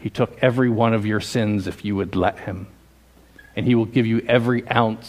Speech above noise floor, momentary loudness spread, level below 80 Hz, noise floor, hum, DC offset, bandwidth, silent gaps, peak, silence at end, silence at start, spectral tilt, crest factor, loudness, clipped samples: 31 dB; 7 LU; -50 dBFS; -52 dBFS; none; under 0.1%; 15 kHz; none; 0 dBFS; 0 s; 0 s; -7 dB/octave; 20 dB; -20 LUFS; under 0.1%